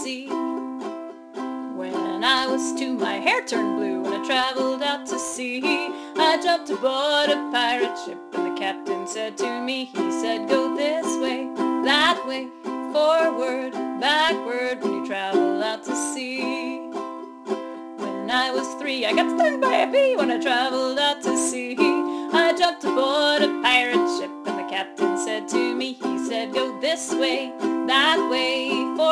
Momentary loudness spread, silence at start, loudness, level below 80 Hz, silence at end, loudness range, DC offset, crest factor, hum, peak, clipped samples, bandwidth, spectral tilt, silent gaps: 11 LU; 0 s; -23 LUFS; -70 dBFS; 0 s; 5 LU; under 0.1%; 20 dB; none; -4 dBFS; under 0.1%; 13.5 kHz; -2 dB/octave; none